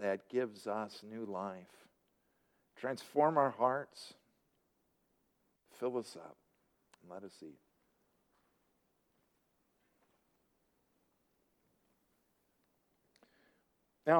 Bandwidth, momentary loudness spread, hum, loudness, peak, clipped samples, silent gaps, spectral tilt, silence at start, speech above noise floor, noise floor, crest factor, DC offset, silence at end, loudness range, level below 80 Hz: over 20 kHz; 22 LU; none; -37 LUFS; -16 dBFS; under 0.1%; none; -6 dB/octave; 0 s; 41 dB; -79 dBFS; 26 dB; under 0.1%; 0 s; 22 LU; -90 dBFS